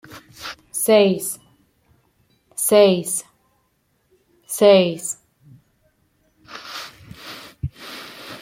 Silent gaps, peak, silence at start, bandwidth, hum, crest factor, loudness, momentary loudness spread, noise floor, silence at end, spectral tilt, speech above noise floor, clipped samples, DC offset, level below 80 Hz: none; -2 dBFS; 0.1 s; 16.5 kHz; none; 20 dB; -18 LUFS; 23 LU; -66 dBFS; 0.05 s; -4 dB/octave; 51 dB; under 0.1%; under 0.1%; -54 dBFS